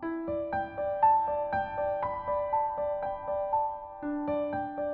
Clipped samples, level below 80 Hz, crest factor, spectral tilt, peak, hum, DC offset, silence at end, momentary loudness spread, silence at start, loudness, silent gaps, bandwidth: under 0.1%; -56 dBFS; 16 dB; -5.5 dB/octave; -14 dBFS; none; under 0.1%; 0 s; 9 LU; 0 s; -31 LUFS; none; 4.3 kHz